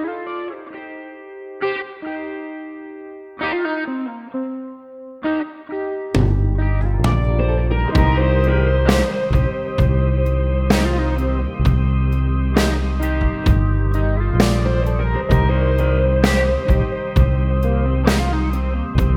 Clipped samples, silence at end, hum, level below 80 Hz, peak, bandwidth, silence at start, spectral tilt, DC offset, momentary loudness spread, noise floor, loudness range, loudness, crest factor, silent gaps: under 0.1%; 0 s; none; -22 dBFS; -2 dBFS; 15 kHz; 0 s; -7 dB/octave; under 0.1%; 15 LU; -37 dBFS; 9 LU; -19 LUFS; 16 dB; none